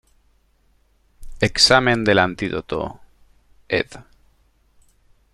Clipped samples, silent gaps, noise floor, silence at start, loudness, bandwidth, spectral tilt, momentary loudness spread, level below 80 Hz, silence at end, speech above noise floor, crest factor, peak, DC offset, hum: under 0.1%; none; -60 dBFS; 1.2 s; -18 LUFS; 13 kHz; -3.5 dB/octave; 15 LU; -44 dBFS; 1.3 s; 42 dB; 22 dB; -2 dBFS; under 0.1%; none